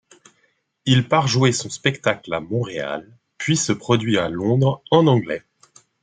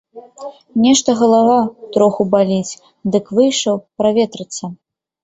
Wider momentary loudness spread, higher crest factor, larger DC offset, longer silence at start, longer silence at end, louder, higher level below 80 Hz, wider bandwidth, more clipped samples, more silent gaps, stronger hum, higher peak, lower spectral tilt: second, 12 LU vs 16 LU; about the same, 18 dB vs 16 dB; neither; first, 0.85 s vs 0.15 s; first, 0.65 s vs 0.5 s; second, -20 LUFS vs -15 LUFS; about the same, -58 dBFS vs -58 dBFS; first, 9.4 kHz vs 8.2 kHz; neither; neither; neither; about the same, -2 dBFS vs 0 dBFS; about the same, -5 dB/octave vs -4.5 dB/octave